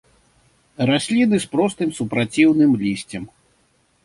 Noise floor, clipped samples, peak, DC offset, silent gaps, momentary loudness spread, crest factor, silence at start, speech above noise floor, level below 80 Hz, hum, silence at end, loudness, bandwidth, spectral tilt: -62 dBFS; under 0.1%; -4 dBFS; under 0.1%; none; 14 LU; 18 dB; 0.8 s; 43 dB; -56 dBFS; none; 0.75 s; -19 LUFS; 11.5 kHz; -5.5 dB/octave